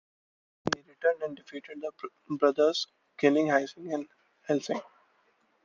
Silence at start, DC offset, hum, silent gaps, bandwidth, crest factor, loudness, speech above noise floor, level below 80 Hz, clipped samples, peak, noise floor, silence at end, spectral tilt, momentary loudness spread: 0.65 s; under 0.1%; none; none; 7.6 kHz; 20 dB; -30 LUFS; 41 dB; -76 dBFS; under 0.1%; -10 dBFS; -69 dBFS; 0.8 s; -4.5 dB/octave; 17 LU